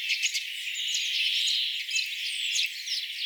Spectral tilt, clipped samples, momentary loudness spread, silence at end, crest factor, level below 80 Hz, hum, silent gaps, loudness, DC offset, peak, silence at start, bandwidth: 13.5 dB/octave; under 0.1%; 6 LU; 0 s; 16 dB; under -90 dBFS; none; none; -27 LUFS; under 0.1%; -14 dBFS; 0 s; over 20 kHz